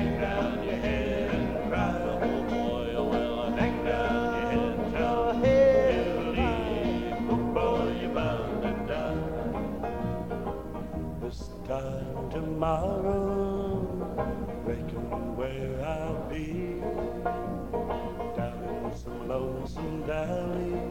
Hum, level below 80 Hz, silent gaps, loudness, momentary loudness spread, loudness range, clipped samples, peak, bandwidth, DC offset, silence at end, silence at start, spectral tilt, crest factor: none; -42 dBFS; none; -30 LUFS; 8 LU; 8 LU; under 0.1%; -12 dBFS; 17 kHz; 0.4%; 0 s; 0 s; -7.5 dB/octave; 18 dB